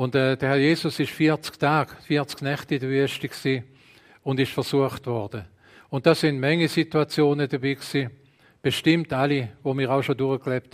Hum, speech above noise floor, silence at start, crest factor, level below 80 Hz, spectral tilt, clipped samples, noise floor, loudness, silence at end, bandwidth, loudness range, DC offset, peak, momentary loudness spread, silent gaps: none; 30 dB; 0 s; 20 dB; -62 dBFS; -6 dB/octave; under 0.1%; -54 dBFS; -24 LUFS; 0.15 s; 15.5 kHz; 3 LU; under 0.1%; -4 dBFS; 8 LU; none